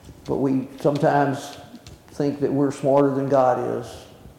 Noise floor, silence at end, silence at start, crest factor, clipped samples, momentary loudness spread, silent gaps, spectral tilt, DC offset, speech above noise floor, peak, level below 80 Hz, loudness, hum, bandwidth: -44 dBFS; 0.1 s; 0.05 s; 16 dB; under 0.1%; 15 LU; none; -7.5 dB/octave; under 0.1%; 23 dB; -6 dBFS; -54 dBFS; -22 LUFS; none; 15 kHz